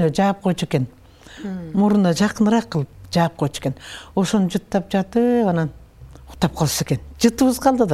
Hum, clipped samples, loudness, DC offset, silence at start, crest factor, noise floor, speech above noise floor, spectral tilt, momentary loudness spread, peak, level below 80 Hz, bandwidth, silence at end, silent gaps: none; under 0.1%; -20 LUFS; under 0.1%; 0 s; 18 dB; -42 dBFS; 23 dB; -6 dB/octave; 10 LU; -2 dBFS; -46 dBFS; 15 kHz; 0 s; none